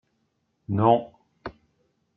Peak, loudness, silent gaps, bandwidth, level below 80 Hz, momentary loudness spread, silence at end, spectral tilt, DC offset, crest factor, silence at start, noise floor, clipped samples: -6 dBFS; -23 LUFS; none; 4.8 kHz; -62 dBFS; 24 LU; 0.65 s; -11 dB/octave; under 0.1%; 22 dB; 0.7 s; -73 dBFS; under 0.1%